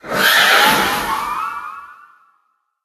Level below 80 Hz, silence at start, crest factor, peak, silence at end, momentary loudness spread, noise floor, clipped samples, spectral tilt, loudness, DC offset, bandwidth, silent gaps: -48 dBFS; 0.05 s; 18 dB; 0 dBFS; 0.9 s; 20 LU; -64 dBFS; under 0.1%; -1 dB/octave; -13 LUFS; under 0.1%; 13.5 kHz; none